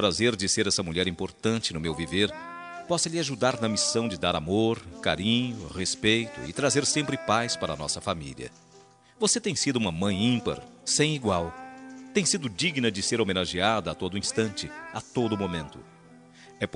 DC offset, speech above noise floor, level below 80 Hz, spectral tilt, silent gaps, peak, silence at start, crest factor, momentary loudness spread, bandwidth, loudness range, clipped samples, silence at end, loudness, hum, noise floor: under 0.1%; 28 dB; -56 dBFS; -3.5 dB/octave; none; -8 dBFS; 0 s; 20 dB; 11 LU; 11 kHz; 2 LU; under 0.1%; 0.1 s; -27 LUFS; none; -55 dBFS